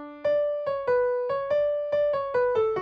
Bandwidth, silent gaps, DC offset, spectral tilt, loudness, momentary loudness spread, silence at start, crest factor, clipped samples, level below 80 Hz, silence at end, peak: 5.8 kHz; none; under 0.1%; -6.5 dB/octave; -26 LUFS; 3 LU; 0 s; 10 dB; under 0.1%; -62 dBFS; 0 s; -16 dBFS